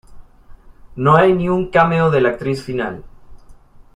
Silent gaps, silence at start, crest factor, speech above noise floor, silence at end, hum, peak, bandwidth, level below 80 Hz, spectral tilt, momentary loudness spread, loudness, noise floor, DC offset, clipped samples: none; 0.1 s; 16 dB; 27 dB; 0.4 s; none; -2 dBFS; 10.5 kHz; -42 dBFS; -8 dB/octave; 13 LU; -16 LUFS; -42 dBFS; under 0.1%; under 0.1%